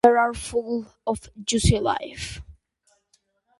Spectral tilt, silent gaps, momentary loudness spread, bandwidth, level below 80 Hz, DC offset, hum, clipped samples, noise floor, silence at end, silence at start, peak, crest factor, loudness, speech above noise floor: -5 dB/octave; none; 14 LU; 11.5 kHz; -38 dBFS; under 0.1%; none; under 0.1%; -68 dBFS; 1.1 s; 0.05 s; -2 dBFS; 22 dB; -25 LUFS; 45 dB